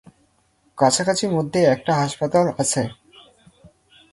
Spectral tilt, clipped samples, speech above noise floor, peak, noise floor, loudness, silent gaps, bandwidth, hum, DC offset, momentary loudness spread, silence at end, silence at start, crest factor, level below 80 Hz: -4.5 dB/octave; under 0.1%; 43 dB; -4 dBFS; -63 dBFS; -20 LUFS; none; 11.5 kHz; none; under 0.1%; 4 LU; 1.2 s; 0.75 s; 18 dB; -58 dBFS